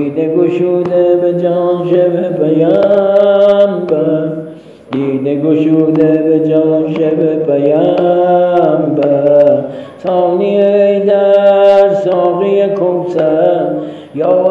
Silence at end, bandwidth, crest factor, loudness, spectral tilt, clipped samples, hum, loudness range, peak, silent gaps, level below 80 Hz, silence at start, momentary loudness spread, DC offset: 0 s; 5.4 kHz; 10 dB; -11 LUFS; -9 dB/octave; under 0.1%; none; 2 LU; 0 dBFS; none; -58 dBFS; 0 s; 7 LU; under 0.1%